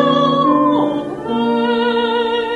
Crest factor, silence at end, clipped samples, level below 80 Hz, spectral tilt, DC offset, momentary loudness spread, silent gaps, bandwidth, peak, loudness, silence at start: 14 dB; 0 s; under 0.1%; -54 dBFS; -6.5 dB/octave; under 0.1%; 6 LU; none; 9.2 kHz; -2 dBFS; -16 LUFS; 0 s